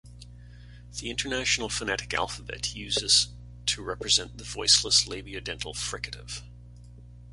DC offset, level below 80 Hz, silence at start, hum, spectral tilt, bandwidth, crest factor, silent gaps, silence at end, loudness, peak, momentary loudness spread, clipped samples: under 0.1%; -48 dBFS; 0.05 s; 60 Hz at -45 dBFS; -1 dB/octave; 11.5 kHz; 24 dB; none; 0 s; -26 LUFS; -6 dBFS; 16 LU; under 0.1%